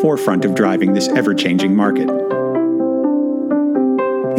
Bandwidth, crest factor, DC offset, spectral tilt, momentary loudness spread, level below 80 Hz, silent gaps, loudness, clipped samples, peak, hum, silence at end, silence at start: 15.5 kHz; 14 dB; under 0.1%; -6 dB/octave; 3 LU; -66 dBFS; none; -16 LUFS; under 0.1%; -2 dBFS; none; 0 s; 0 s